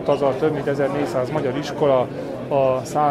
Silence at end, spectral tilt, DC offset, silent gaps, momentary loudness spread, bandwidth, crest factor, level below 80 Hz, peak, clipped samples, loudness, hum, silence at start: 0 s; -6.5 dB/octave; under 0.1%; none; 5 LU; 14 kHz; 14 dB; -52 dBFS; -6 dBFS; under 0.1%; -21 LUFS; none; 0 s